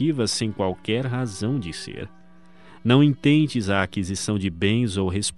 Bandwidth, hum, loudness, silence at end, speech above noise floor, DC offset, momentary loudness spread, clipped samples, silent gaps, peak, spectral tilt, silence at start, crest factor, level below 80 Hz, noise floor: 11.5 kHz; none; -23 LUFS; 0.05 s; 29 dB; 0.4%; 13 LU; under 0.1%; none; -4 dBFS; -5.5 dB/octave; 0 s; 18 dB; -52 dBFS; -52 dBFS